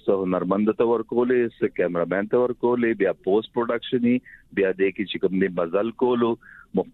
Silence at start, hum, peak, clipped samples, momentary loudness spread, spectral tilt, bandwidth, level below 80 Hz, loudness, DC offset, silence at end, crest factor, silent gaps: 0.05 s; none; -8 dBFS; under 0.1%; 4 LU; -9.5 dB/octave; 4.1 kHz; -60 dBFS; -23 LUFS; under 0.1%; 0.05 s; 14 dB; none